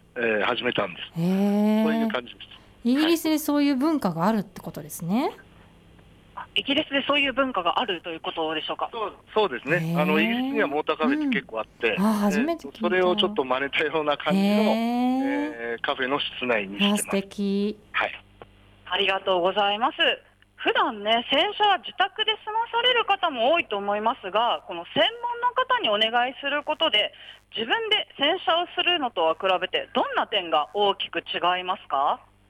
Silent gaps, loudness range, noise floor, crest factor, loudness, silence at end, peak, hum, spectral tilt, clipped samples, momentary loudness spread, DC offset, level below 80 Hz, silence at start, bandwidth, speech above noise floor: none; 3 LU; -52 dBFS; 14 dB; -24 LUFS; 0.35 s; -10 dBFS; none; -4.5 dB/octave; under 0.1%; 8 LU; under 0.1%; -62 dBFS; 0.15 s; 16 kHz; 28 dB